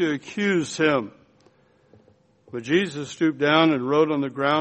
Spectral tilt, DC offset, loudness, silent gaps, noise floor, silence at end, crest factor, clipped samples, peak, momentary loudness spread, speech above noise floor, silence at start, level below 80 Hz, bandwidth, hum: -5 dB/octave; under 0.1%; -22 LUFS; none; -59 dBFS; 0 s; 20 dB; under 0.1%; -4 dBFS; 10 LU; 37 dB; 0 s; -66 dBFS; 8.4 kHz; none